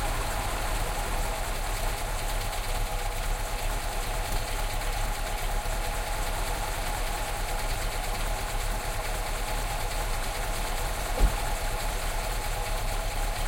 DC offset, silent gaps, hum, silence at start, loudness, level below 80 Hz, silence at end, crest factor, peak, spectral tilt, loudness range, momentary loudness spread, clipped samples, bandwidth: under 0.1%; none; none; 0 s; -32 LUFS; -30 dBFS; 0 s; 18 dB; -10 dBFS; -3 dB/octave; 1 LU; 1 LU; under 0.1%; 16.5 kHz